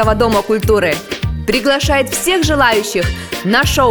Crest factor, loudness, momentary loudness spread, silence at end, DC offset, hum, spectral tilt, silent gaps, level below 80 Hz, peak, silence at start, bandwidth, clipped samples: 14 dB; -14 LUFS; 8 LU; 0 s; under 0.1%; none; -4 dB/octave; none; -26 dBFS; 0 dBFS; 0 s; over 20 kHz; under 0.1%